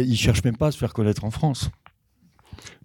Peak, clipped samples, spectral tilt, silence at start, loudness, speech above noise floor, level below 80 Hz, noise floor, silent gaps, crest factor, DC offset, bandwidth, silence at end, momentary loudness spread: -4 dBFS; under 0.1%; -6 dB/octave; 0 s; -23 LUFS; 39 dB; -40 dBFS; -62 dBFS; none; 20 dB; under 0.1%; 18 kHz; 0.15 s; 14 LU